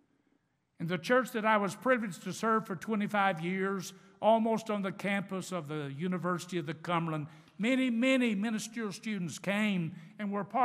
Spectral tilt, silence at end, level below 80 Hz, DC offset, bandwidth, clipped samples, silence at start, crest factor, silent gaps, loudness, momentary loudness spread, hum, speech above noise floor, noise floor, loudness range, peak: -5.5 dB/octave; 0 s; -86 dBFS; under 0.1%; 15.5 kHz; under 0.1%; 0.8 s; 20 dB; none; -32 LUFS; 10 LU; none; 43 dB; -75 dBFS; 2 LU; -12 dBFS